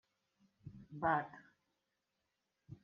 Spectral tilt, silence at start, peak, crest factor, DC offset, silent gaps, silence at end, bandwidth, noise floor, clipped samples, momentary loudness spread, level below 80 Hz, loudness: -5.5 dB/octave; 0.65 s; -22 dBFS; 24 dB; under 0.1%; none; 0.1 s; 6.8 kHz; -87 dBFS; under 0.1%; 23 LU; -74 dBFS; -38 LUFS